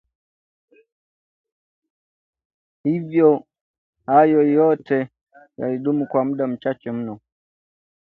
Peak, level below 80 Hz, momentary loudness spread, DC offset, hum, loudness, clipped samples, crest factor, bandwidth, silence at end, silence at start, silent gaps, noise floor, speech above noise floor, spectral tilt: -2 dBFS; -68 dBFS; 14 LU; under 0.1%; none; -20 LUFS; under 0.1%; 20 dB; 4.3 kHz; 0.85 s; 2.85 s; 3.61-3.93 s, 5.21-5.27 s; under -90 dBFS; over 72 dB; -10.5 dB/octave